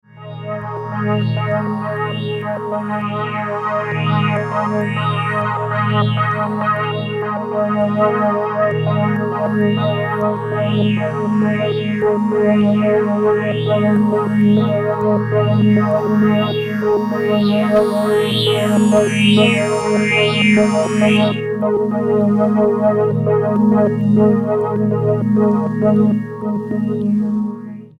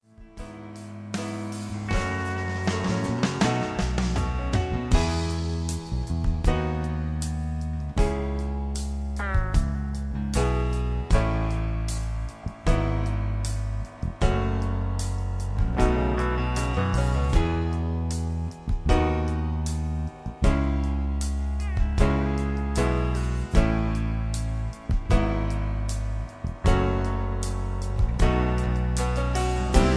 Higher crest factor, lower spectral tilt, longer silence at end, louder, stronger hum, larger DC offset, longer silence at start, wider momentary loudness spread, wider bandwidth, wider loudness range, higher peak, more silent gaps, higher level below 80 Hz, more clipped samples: second, 14 dB vs 20 dB; about the same, -7 dB/octave vs -6.5 dB/octave; first, 0.15 s vs 0 s; first, -16 LUFS vs -27 LUFS; neither; neither; about the same, 0.15 s vs 0.2 s; about the same, 8 LU vs 7 LU; first, 12.5 kHz vs 11 kHz; first, 5 LU vs 2 LU; first, -2 dBFS vs -6 dBFS; neither; second, -56 dBFS vs -28 dBFS; neither